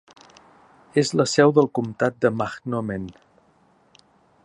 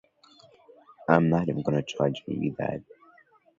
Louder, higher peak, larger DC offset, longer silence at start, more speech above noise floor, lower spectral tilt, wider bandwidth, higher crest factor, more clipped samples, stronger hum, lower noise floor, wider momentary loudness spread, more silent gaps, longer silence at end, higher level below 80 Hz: first, -22 LUFS vs -27 LUFS; about the same, -2 dBFS vs -4 dBFS; neither; about the same, 0.95 s vs 1 s; first, 38 dB vs 33 dB; second, -5.5 dB/octave vs -7.5 dB/octave; first, 10.5 kHz vs 7.6 kHz; about the same, 22 dB vs 24 dB; neither; neither; about the same, -59 dBFS vs -59 dBFS; about the same, 13 LU vs 11 LU; neither; first, 1.35 s vs 0.8 s; about the same, -60 dBFS vs -58 dBFS